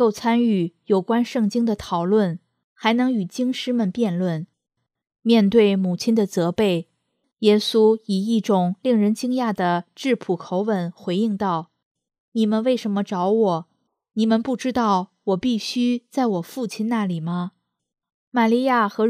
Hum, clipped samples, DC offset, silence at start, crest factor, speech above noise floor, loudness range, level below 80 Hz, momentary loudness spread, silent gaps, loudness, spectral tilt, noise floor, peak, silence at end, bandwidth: none; under 0.1%; under 0.1%; 0 s; 18 dB; 53 dB; 4 LU; -60 dBFS; 8 LU; 2.64-2.76 s, 7.33-7.37 s, 11.85-11.95 s, 12.20-12.32 s, 18.14-18.32 s; -21 LUFS; -6.5 dB/octave; -73 dBFS; -4 dBFS; 0 s; 14.5 kHz